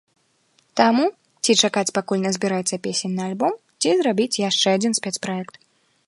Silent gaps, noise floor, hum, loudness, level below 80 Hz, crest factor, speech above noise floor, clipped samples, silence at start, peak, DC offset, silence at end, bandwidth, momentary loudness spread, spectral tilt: none; -63 dBFS; none; -21 LUFS; -72 dBFS; 20 dB; 42 dB; under 0.1%; 0.75 s; -2 dBFS; under 0.1%; 0.65 s; 11.5 kHz; 9 LU; -3.5 dB/octave